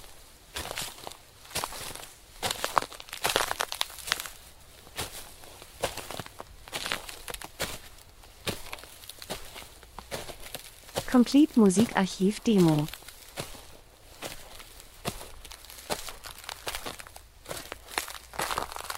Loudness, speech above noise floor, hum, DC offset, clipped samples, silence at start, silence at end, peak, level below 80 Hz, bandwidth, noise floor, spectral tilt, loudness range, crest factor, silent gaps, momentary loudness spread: -30 LUFS; 28 dB; none; under 0.1%; under 0.1%; 0 s; 0 s; -2 dBFS; -52 dBFS; 16 kHz; -51 dBFS; -4 dB/octave; 14 LU; 30 dB; none; 23 LU